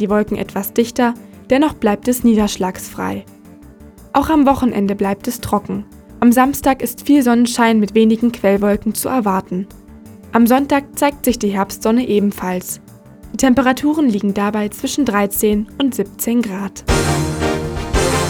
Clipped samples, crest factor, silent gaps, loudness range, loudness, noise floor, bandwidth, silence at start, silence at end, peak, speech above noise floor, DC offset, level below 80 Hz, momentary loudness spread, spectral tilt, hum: under 0.1%; 16 dB; none; 3 LU; -16 LUFS; -40 dBFS; over 20 kHz; 0 s; 0 s; 0 dBFS; 25 dB; under 0.1%; -34 dBFS; 10 LU; -5 dB/octave; none